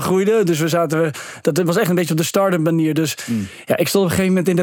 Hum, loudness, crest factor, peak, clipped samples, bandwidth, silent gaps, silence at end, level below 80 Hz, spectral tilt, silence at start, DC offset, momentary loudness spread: none; -18 LUFS; 14 dB; -2 dBFS; under 0.1%; 19 kHz; none; 0 s; -60 dBFS; -5.5 dB/octave; 0 s; under 0.1%; 6 LU